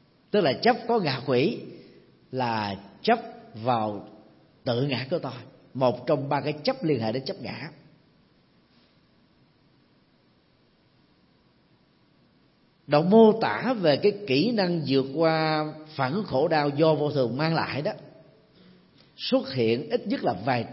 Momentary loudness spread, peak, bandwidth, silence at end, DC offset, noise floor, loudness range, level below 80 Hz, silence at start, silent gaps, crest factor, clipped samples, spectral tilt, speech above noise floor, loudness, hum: 12 LU; -6 dBFS; 5.8 kHz; 0 s; under 0.1%; -63 dBFS; 8 LU; -70 dBFS; 0.35 s; none; 20 dB; under 0.1%; -10 dB/octave; 38 dB; -25 LUFS; none